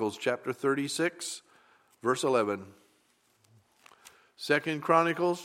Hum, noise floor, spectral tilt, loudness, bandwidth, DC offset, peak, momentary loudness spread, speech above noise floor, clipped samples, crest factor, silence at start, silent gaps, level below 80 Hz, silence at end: none; -69 dBFS; -4 dB/octave; -29 LUFS; 16.5 kHz; under 0.1%; -8 dBFS; 13 LU; 40 dB; under 0.1%; 22 dB; 0 s; none; -82 dBFS; 0 s